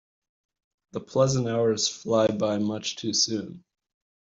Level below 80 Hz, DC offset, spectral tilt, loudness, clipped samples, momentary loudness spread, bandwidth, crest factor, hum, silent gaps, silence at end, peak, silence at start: -64 dBFS; under 0.1%; -4 dB/octave; -25 LUFS; under 0.1%; 11 LU; 7.8 kHz; 20 dB; none; none; 0.7 s; -8 dBFS; 0.95 s